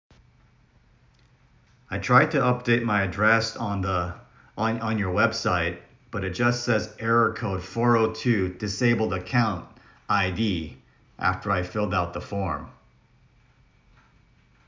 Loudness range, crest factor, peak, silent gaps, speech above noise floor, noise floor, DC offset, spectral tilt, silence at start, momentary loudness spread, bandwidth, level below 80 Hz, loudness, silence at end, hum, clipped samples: 5 LU; 22 dB; -4 dBFS; none; 35 dB; -59 dBFS; under 0.1%; -6 dB/octave; 1.9 s; 11 LU; 7.6 kHz; -46 dBFS; -25 LUFS; 1.95 s; none; under 0.1%